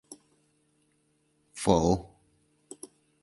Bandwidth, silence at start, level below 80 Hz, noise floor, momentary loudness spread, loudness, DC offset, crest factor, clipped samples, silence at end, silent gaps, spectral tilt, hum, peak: 11.5 kHz; 0.1 s; -50 dBFS; -71 dBFS; 26 LU; -27 LUFS; under 0.1%; 26 dB; under 0.1%; 1.15 s; none; -6 dB/octave; none; -6 dBFS